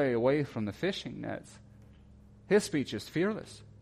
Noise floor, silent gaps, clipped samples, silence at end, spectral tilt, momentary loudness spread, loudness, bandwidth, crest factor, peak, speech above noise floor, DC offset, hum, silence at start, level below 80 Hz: -56 dBFS; none; under 0.1%; 0.05 s; -5.5 dB/octave; 14 LU; -32 LUFS; 14.5 kHz; 18 dB; -14 dBFS; 24 dB; under 0.1%; none; 0 s; -62 dBFS